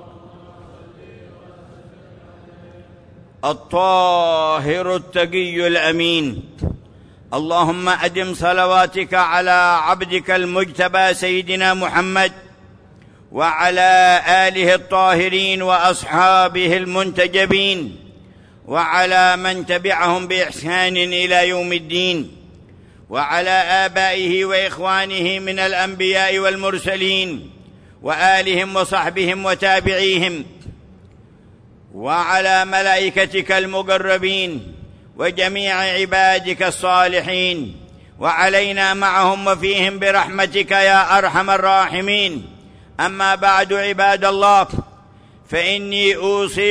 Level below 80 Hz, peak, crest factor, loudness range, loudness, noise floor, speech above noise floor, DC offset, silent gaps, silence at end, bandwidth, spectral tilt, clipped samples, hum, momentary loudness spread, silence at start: -48 dBFS; -2 dBFS; 14 dB; 4 LU; -16 LUFS; -46 dBFS; 30 dB; under 0.1%; none; 0 s; 11 kHz; -3.5 dB/octave; under 0.1%; none; 9 LU; 0.05 s